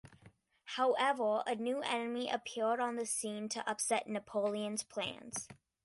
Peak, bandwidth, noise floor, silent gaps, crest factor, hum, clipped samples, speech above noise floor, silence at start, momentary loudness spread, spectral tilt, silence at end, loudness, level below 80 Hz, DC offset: -20 dBFS; 12 kHz; -64 dBFS; none; 18 dB; none; under 0.1%; 28 dB; 0.05 s; 8 LU; -2.5 dB/octave; 0.3 s; -36 LUFS; -78 dBFS; under 0.1%